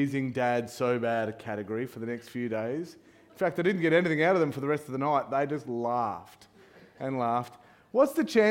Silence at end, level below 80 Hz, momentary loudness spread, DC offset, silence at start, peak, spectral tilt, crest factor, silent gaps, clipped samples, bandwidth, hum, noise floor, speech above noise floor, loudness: 0 s; -72 dBFS; 11 LU; under 0.1%; 0 s; -10 dBFS; -6.5 dB/octave; 18 dB; none; under 0.1%; 16.5 kHz; none; -55 dBFS; 27 dB; -29 LUFS